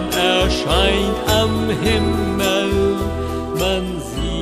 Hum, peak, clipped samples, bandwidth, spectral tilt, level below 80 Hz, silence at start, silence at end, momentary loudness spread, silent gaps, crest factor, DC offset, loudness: none; -2 dBFS; under 0.1%; 15.5 kHz; -4.5 dB/octave; -28 dBFS; 0 s; 0 s; 8 LU; none; 16 dB; under 0.1%; -18 LUFS